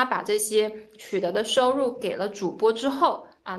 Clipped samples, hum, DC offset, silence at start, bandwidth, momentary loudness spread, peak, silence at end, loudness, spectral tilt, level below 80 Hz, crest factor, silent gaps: under 0.1%; none; under 0.1%; 0 s; 12.5 kHz; 8 LU; -6 dBFS; 0 s; -25 LUFS; -3 dB/octave; -68 dBFS; 18 dB; none